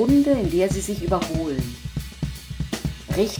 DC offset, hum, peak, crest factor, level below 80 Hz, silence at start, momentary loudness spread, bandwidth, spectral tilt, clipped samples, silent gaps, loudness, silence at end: under 0.1%; none; -8 dBFS; 16 dB; -36 dBFS; 0 s; 13 LU; over 20 kHz; -6 dB/octave; under 0.1%; none; -24 LUFS; 0 s